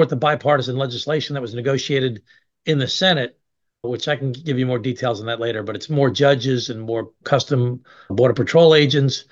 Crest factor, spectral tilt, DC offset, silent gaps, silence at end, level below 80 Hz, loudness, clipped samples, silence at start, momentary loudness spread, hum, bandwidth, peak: 18 dB; -5.5 dB/octave; under 0.1%; none; 0.1 s; -60 dBFS; -19 LUFS; under 0.1%; 0 s; 12 LU; none; 7.6 kHz; -2 dBFS